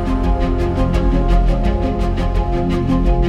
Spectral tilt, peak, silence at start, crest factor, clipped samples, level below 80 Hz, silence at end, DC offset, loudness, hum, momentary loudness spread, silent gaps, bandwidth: -8.5 dB/octave; -4 dBFS; 0 s; 12 dB; under 0.1%; -16 dBFS; 0 s; under 0.1%; -18 LUFS; none; 3 LU; none; 7 kHz